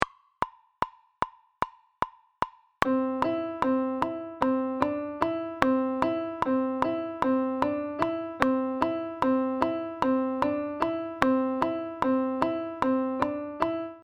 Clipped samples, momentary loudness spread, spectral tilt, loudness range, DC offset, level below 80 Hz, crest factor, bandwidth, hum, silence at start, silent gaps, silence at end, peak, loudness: under 0.1%; 9 LU; -6.5 dB/octave; 3 LU; under 0.1%; -56 dBFS; 28 dB; 9 kHz; none; 0 s; none; 0.05 s; 0 dBFS; -29 LUFS